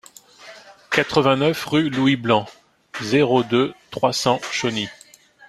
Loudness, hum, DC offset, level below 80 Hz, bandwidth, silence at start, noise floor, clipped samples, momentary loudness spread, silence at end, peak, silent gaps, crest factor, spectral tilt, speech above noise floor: -20 LUFS; none; under 0.1%; -58 dBFS; 14 kHz; 0.4 s; -49 dBFS; under 0.1%; 10 LU; 0.55 s; -2 dBFS; none; 20 dB; -5 dB/octave; 30 dB